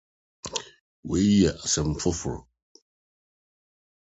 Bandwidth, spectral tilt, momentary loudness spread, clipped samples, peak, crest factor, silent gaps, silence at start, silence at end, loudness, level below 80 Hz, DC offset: 8.2 kHz; -4.5 dB/octave; 19 LU; under 0.1%; -8 dBFS; 20 dB; 0.81-1.03 s; 0.45 s; 1.75 s; -25 LUFS; -44 dBFS; under 0.1%